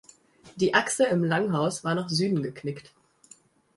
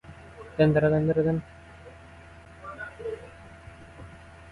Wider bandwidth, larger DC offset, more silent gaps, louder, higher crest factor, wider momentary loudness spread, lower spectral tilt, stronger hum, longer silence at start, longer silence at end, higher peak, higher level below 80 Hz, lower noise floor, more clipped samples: about the same, 11.5 kHz vs 10.5 kHz; neither; neither; about the same, -26 LUFS vs -25 LUFS; about the same, 20 dB vs 22 dB; second, 12 LU vs 25 LU; second, -4.5 dB/octave vs -9 dB/octave; neither; first, 0.45 s vs 0.05 s; first, 0.95 s vs 0 s; about the same, -6 dBFS vs -6 dBFS; second, -66 dBFS vs -52 dBFS; first, -57 dBFS vs -48 dBFS; neither